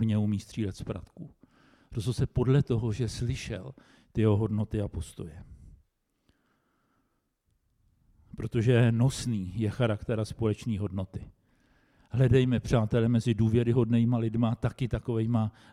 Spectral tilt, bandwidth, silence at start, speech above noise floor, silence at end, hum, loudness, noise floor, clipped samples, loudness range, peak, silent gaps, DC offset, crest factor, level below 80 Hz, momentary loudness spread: -7.5 dB/octave; 11.5 kHz; 0 s; 48 dB; 0.25 s; none; -28 LUFS; -76 dBFS; under 0.1%; 7 LU; -12 dBFS; none; under 0.1%; 18 dB; -50 dBFS; 15 LU